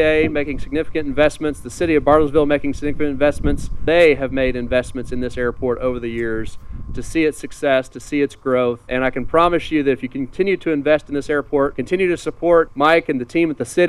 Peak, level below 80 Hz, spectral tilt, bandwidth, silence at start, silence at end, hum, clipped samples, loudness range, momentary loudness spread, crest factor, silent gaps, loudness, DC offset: 0 dBFS; -34 dBFS; -6 dB/octave; 13 kHz; 0 s; 0 s; none; under 0.1%; 5 LU; 10 LU; 16 dB; none; -19 LUFS; under 0.1%